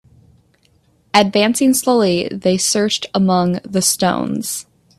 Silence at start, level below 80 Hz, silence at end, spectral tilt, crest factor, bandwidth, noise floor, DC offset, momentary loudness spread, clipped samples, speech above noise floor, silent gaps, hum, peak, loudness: 1.15 s; -56 dBFS; 0.35 s; -4 dB/octave; 18 dB; 14.5 kHz; -57 dBFS; under 0.1%; 7 LU; under 0.1%; 41 dB; none; none; 0 dBFS; -16 LUFS